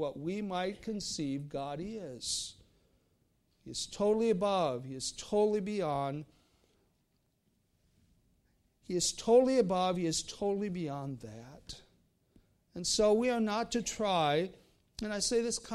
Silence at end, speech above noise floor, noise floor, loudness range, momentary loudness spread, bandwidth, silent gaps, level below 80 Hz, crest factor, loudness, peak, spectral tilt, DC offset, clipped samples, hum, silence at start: 0 s; 43 dB; -76 dBFS; 8 LU; 15 LU; 14 kHz; none; -62 dBFS; 20 dB; -33 LUFS; -14 dBFS; -4 dB/octave; under 0.1%; under 0.1%; none; 0 s